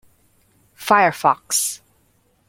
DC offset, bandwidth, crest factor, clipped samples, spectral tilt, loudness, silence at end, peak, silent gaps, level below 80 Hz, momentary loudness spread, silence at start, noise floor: under 0.1%; 16.5 kHz; 20 dB; under 0.1%; -2 dB/octave; -18 LUFS; 0.75 s; -2 dBFS; none; -64 dBFS; 15 LU; 0.8 s; -61 dBFS